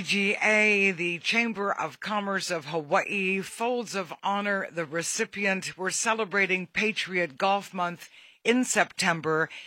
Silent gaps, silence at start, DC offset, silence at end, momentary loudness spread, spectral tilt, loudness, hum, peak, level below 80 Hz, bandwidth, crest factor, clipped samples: none; 0 s; under 0.1%; 0 s; 8 LU; -3 dB/octave; -26 LUFS; none; -8 dBFS; -74 dBFS; 16.5 kHz; 20 dB; under 0.1%